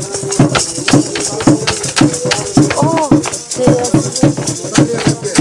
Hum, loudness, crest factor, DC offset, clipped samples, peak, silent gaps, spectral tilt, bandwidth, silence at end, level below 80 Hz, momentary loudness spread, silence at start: none; -12 LUFS; 12 dB; 0.2%; under 0.1%; 0 dBFS; none; -4.5 dB/octave; 11.5 kHz; 0 s; -38 dBFS; 4 LU; 0 s